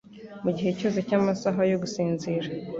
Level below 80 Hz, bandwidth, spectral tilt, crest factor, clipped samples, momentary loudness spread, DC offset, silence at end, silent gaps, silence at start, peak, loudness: -62 dBFS; 7.8 kHz; -6.5 dB/octave; 16 dB; under 0.1%; 6 LU; under 0.1%; 0 s; none; 0.1 s; -12 dBFS; -27 LUFS